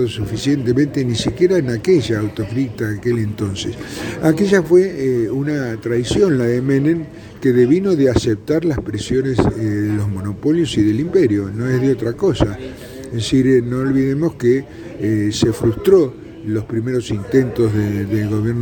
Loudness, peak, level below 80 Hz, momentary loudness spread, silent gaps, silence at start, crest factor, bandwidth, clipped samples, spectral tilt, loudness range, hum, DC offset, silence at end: -17 LUFS; 0 dBFS; -40 dBFS; 9 LU; none; 0 s; 16 dB; 19.5 kHz; under 0.1%; -7 dB/octave; 2 LU; none; under 0.1%; 0 s